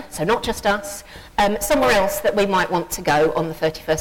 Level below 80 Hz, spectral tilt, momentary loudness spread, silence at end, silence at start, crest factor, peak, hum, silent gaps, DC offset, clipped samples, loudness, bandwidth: -40 dBFS; -4 dB/octave; 8 LU; 0 s; 0 s; 12 dB; -8 dBFS; none; none; under 0.1%; under 0.1%; -20 LUFS; 17.5 kHz